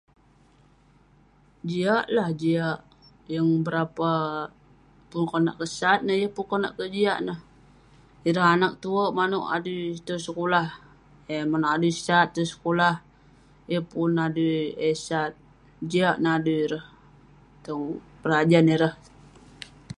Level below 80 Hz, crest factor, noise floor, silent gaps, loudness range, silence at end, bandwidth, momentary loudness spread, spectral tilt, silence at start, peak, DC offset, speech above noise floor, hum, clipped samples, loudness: -62 dBFS; 20 dB; -58 dBFS; none; 3 LU; 0.05 s; 11.5 kHz; 13 LU; -6 dB/octave; 1.65 s; -6 dBFS; under 0.1%; 34 dB; none; under 0.1%; -25 LUFS